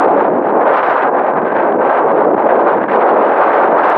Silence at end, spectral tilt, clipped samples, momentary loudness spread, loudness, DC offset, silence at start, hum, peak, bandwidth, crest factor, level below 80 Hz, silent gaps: 0 s; -8.5 dB/octave; under 0.1%; 3 LU; -11 LUFS; under 0.1%; 0 s; none; 0 dBFS; 5.2 kHz; 10 dB; -66 dBFS; none